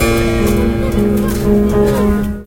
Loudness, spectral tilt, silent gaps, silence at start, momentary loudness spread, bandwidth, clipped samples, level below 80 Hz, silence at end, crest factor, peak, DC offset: -14 LUFS; -6.5 dB/octave; none; 0 s; 2 LU; 17 kHz; under 0.1%; -22 dBFS; 0 s; 12 dB; 0 dBFS; under 0.1%